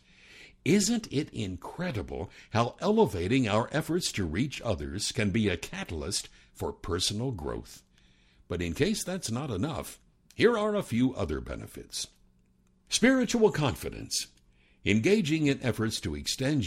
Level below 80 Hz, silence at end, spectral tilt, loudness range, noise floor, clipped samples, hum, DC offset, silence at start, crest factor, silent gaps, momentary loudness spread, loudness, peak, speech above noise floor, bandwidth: -50 dBFS; 0 s; -4.5 dB/octave; 5 LU; -65 dBFS; under 0.1%; none; under 0.1%; 0.3 s; 20 dB; none; 13 LU; -29 LUFS; -10 dBFS; 36 dB; 16 kHz